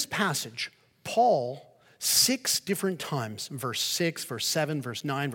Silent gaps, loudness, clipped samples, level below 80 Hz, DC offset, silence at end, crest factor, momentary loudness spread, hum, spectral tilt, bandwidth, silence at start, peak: none; -27 LUFS; under 0.1%; -72 dBFS; under 0.1%; 0 s; 20 dB; 13 LU; none; -2.5 dB/octave; 17 kHz; 0 s; -10 dBFS